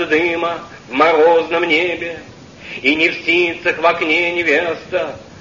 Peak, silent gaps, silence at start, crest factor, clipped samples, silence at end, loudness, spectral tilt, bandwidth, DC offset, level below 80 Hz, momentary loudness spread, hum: 0 dBFS; none; 0 s; 16 dB; under 0.1%; 0 s; -15 LUFS; -4.5 dB/octave; 7.4 kHz; 0.1%; -52 dBFS; 14 LU; none